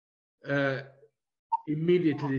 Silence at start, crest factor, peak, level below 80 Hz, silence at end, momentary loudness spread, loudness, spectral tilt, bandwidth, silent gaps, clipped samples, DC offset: 0.45 s; 16 dB; -14 dBFS; -72 dBFS; 0 s; 11 LU; -29 LUFS; -8.5 dB/octave; 6.6 kHz; 1.39-1.50 s; under 0.1%; under 0.1%